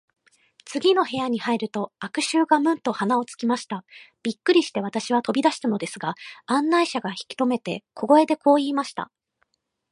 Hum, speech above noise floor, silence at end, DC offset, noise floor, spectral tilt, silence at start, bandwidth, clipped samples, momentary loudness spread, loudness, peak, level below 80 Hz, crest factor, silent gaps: none; 49 dB; 0.9 s; under 0.1%; -72 dBFS; -4.5 dB/octave; 0.65 s; 11.5 kHz; under 0.1%; 12 LU; -23 LUFS; -4 dBFS; -74 dBFS; 20 dB; none